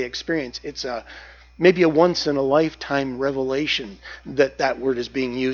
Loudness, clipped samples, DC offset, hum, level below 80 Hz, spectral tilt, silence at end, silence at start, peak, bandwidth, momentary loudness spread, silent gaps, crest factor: -21 LUFS; under 0.1%; under 0.1%; 60 Hz at -50 dBFS; -50 dBFS; -5 dB/octave; 0 s; 0 s; -2 dBFS; 7.2 kHz; 14 LU; none; 20 dB